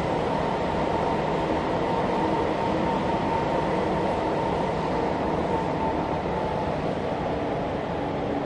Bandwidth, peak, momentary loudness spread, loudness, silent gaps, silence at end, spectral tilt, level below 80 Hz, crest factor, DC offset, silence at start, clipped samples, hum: 11 kHz; -12 dBFS; 3 LU; -26 LUFS; none; 0 s; -7 dB/octave; -42 dBFS; 14 dB; under 0.1%; 0 s; under 0.1%; none